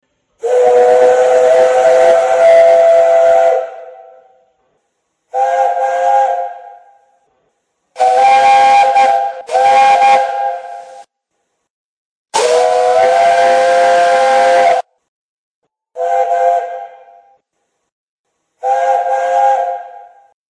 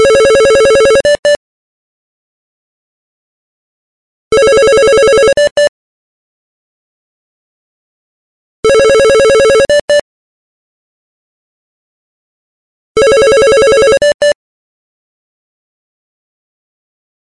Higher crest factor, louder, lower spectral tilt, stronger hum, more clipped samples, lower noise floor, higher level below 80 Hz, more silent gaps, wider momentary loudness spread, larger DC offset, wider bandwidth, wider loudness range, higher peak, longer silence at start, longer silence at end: about the same, 12 dB vs 12 dB; about the same, -10 LUFS vs -8 LUFS; about the same, -1.5 dB/octave vs -2.5 dB/octave; neither; neither; second, -69 dBFS vs under -90 dBFS; second, -60 dBFS vs -38 dBFS; second, 11.70-12.25 s, 15.08-15.62 s, 17.92-18.24 s vs 1.19-1.23 s, 1.36-4.31 s, 5.51-5.56 s, 5.69-8.63 s, 9.81-9.88 s, 10.01-12.95 s, 14.14-14.20 s; first, 13 LU vs 6 LU; second, under 0.1% vs 0.5%; about the same, 10.5 kHz vs 11.5 kHz; about the same, 9 LU vs 9 LU; about the same, 0 dBFS vs 0 dBFS; first, 0.45 s vs 0 s; second, 0.5 s vs 2.95 s